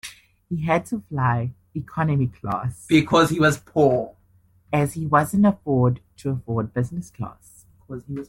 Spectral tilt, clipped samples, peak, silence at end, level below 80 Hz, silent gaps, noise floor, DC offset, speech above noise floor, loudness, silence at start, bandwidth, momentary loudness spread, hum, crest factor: -6.5 dB/octave; under 0.1%; -6 dBFS; 0.05 s; -52 dBFS; none; -58 dBFS; under 0.1%; 37 dB; -22 LUFS; 0.05 s; 16.5 kHz; 16 LU; none; 18 dB